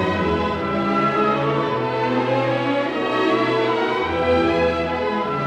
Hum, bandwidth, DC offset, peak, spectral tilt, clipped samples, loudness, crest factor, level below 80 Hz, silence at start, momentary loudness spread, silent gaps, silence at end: none; 9.8 kHz; under 0.1%; -8 dBFS; -7 dB/octave; under 0.1%; -20 LUFS; 12 dB; -46 dBFS; 0 s; 4 LU; none; 0 s